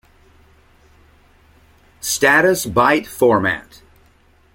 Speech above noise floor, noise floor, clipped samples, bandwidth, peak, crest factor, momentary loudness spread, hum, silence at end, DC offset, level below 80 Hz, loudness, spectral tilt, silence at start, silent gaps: 38 dB; -53 dBFS; under 0.1%; 16.5 kHz; -2 dBFS; 18 dB; 11 LU; none; 0.95 s; under 0.1%; -50 dBFS; -16 LUFS; -3.5 dB/octave; 2.05 s; none